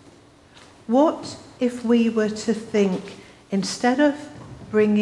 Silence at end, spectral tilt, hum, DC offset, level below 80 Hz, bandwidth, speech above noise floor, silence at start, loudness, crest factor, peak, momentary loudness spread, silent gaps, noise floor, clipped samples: 0 s; -5.5 dB/octave; none; under 0.1%; -60 dBFS; 12 kHz; 29 dB; 0.9 s; -22 LUFS; 16 dB; -6 dBFS; 17 LU; none; -50 dBFS; under 0.1%